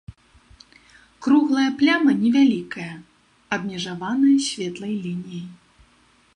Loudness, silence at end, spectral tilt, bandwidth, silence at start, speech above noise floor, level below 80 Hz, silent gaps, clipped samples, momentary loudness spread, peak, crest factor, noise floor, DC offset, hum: -21 LUFS; 0.8 s; -4.5 dB/octave; 10.5 kHz; 0.1 s; 38 dB; -58 dBFS; none; under 0.1%; 17 LU; -6 dBFS; 16 dB; -58 dBFS; under 0.1%; none